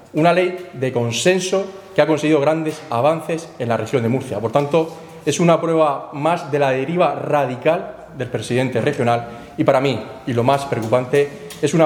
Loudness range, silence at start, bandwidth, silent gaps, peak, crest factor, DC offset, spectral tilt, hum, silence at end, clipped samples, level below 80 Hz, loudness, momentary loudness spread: 2 LU; 0.15 s; 18.5 kHz; none; 0 dBFS; 18 dB; under 0.1%; -5.5 dB/octave; none; 0 s; under 0.1%; -58 dBFS; -19 LUFS; 8 LU